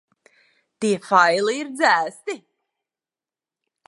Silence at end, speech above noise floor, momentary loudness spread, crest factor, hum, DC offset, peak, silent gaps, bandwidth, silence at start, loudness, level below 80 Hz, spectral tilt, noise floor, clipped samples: 1.5 s; over 70 dB; 16 LU; 22 dB; none; under 0.1%; -2 dBFS; none; 11.5 kHz; 0.8 s; -19 LUFS; -78 dBFS; -3.5 dB/octave; under -90 dBFS; under 0.1%